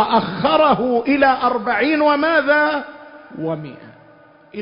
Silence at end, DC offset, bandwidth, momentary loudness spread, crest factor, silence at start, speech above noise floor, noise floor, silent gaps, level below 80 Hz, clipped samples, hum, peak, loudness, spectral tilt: 0 s; under 0.1%; 5.4 kHz; 17 LU; 14 dB; 0 s; 31 dB; -47 dBFS; none; -54 dBFS; under 0.1%; none; -4 dBFS; -16 LUFS; -10 dB/octave